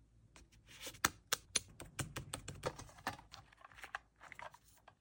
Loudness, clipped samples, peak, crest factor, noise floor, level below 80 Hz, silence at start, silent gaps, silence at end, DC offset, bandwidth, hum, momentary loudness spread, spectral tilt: -43 LUFS; under 0.1%; -14 dBFS; 32 dB; -65 dBFS; -64 dBFS; 0 s; none; 0.1 s; under 0.1%; 17 kHz; none; 22 LU; -1.5 dB/octave